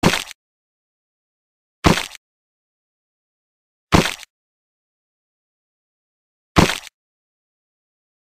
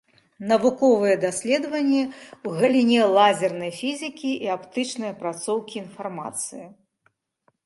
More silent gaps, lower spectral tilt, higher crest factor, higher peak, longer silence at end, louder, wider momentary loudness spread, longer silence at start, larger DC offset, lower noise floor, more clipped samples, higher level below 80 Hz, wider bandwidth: first, 0.35-1.83 s, 2.17-3.87 s, 4.30-6.55 s vs none; about the same, -4.5 dB/octave vs -4 dB/octave; about the same, 22 dB vs 18 dB; about the same, -2 dBFS vs -4 dBFS; first, 1.4 s vs 0.95 s; first, -19 LUFS vs -23 LUFS; about the same, 15 LU vs 15 LU; second, 0.05 s vs 0.4 s; neither; first, under -90 dBFS vs -68 dBFS; neither; first, -38 dBFS vs -72 dBFS; first, 15.5 kHz vs 11.5 kHz